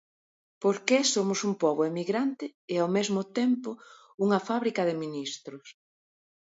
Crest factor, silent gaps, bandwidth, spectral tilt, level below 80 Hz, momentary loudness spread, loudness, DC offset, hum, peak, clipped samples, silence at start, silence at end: 20 dB; 2.54-2.68 s, 4.14-4.18 s; 8 kHz; -4 dB/octave; -78 dBFS; 15 LU; -28 LUFS; under 0.1%; none; -8 dBFS; under 0.1%; 0.6 s; 0.8 s